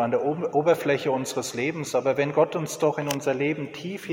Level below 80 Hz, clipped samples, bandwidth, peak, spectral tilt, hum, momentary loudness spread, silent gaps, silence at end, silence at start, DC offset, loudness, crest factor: -68 dBFS; under 0.1%; 17 kHz; -8 dBFS; -5 dB/octave; none; 6 LU; none; 0 s; 0 s; under 0.1%; -25 LUFS; 16 dB